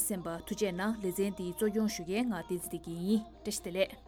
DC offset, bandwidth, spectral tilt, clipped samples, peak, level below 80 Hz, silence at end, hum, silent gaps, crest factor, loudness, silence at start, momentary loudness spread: under 0.1%; 19.5 kHz; -4.5 dB/octave; under 0.1%; -18 dBFS; -58 dBFS; 0 s; none; none; 16 dB; -34 LUFS; 0 s; 6 LU